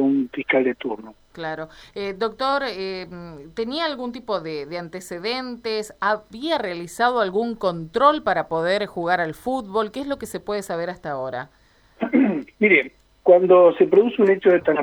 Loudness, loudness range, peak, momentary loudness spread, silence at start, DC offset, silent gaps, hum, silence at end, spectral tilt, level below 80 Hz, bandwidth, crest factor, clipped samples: -21 LUFS; 9 LU; -2 dBFS; 15 LU; 0 s; under 0.1%; none; none; 0 s; -5.5 dB/octave; -56 dBFS; 15 kHz; 20 dB; under 0.1%